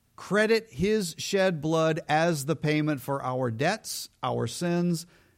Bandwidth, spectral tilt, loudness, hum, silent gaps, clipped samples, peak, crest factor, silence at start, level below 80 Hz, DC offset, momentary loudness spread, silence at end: 16.5 kHz; -5 dB/octave; -27 LUFS; none; none; under 0.1%; -12 dBFS; 16 dB; 0.2 s; -58 dBFS; under 0.1%; 6 LU; 0.35 s